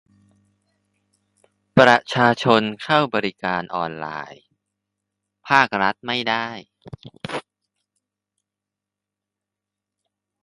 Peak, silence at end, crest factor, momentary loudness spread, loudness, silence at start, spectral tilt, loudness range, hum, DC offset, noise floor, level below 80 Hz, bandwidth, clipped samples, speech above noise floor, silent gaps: 0 dBFS; 3.05 s; 24 dB; 19 LU; -19 LUFS; 1.75 s; -5.5 dB/octave; 20 LU; 50 Hz at -55 dBFS; under 0.1%; -86 dBFS; -62 dBFS; 11.5 kHz; under 0.1%; 66 dB; none